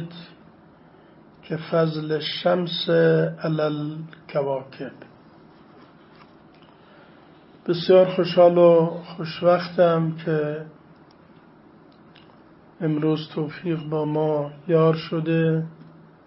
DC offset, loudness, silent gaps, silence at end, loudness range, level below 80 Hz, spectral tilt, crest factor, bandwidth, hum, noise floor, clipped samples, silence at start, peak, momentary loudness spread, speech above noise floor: under 0.1%; -22 LUFS; none; 0.45 s; 11 LU; -66 dBFS; -11 dB/octave; 18 dB; 5.8 kHz; none; -51 dBFS; under 0.1%; 0 s; -4 dBFS; 16 LU; 30 dB